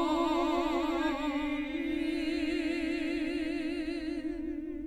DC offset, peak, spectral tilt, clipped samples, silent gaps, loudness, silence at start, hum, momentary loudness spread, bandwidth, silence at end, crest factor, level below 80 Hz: under 0.1%; -18 dBFS; -4.5 dB/octave; under 0.1%; none; -33 LUFS; 0 s; none; 7 LU; 13 kHz; 0 s; 14 dB; -52 dBFS